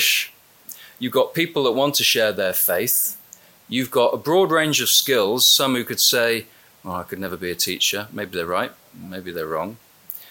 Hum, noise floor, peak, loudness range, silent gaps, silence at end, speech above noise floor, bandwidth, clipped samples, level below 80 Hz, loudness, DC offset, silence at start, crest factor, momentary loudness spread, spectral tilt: none; -48 dBFS; -4 dBFS; 8 LU; none; 0.05 s; 27 dB; 17 kHz; under 0.1%; -64 dBFS; -19 LUFS; under 0.1%; 0 s; 18 dB; 17 LU; -2 dB/octave